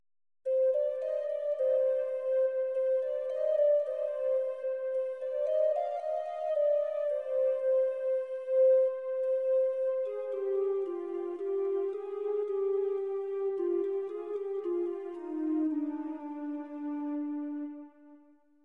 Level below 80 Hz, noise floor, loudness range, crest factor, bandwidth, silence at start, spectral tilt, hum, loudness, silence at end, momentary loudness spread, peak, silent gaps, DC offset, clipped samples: under -90 dBFS; -61 dBFS; 6 LU; 12 dB; 3.8 kHz; 0.45 s; -6 dB/octave; none; -31 LUFS; 0.5 s; 9 LU; -18 dBFS; none; under 0.1%; under 0.1%